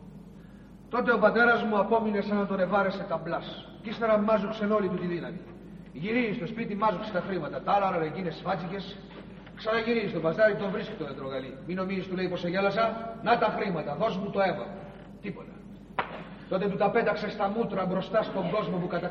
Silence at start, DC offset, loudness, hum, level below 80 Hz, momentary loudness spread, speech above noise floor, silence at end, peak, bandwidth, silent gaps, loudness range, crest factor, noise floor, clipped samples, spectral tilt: 0 s; under 0.1%; -28 LUFS; none; -56 dBFS; 16 LU; 21 dB; 0 s; -10 dBFS; 6.8 kHz; none; 4 LU; 20 dB; -49 dBFS; under 0.1%; -8 dB/octave